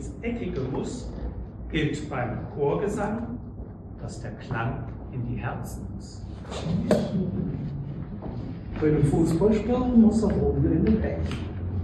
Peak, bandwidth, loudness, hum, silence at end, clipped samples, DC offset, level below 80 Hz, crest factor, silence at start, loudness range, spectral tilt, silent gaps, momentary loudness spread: -6 dBFS; 12.5 kHz; -27 LUFS; none; 0 s; under 0.1%; under 0.1%; -38 dBFS; 20 dB; 0 s; 10 LU; -8 dB/octave; none; 15 LU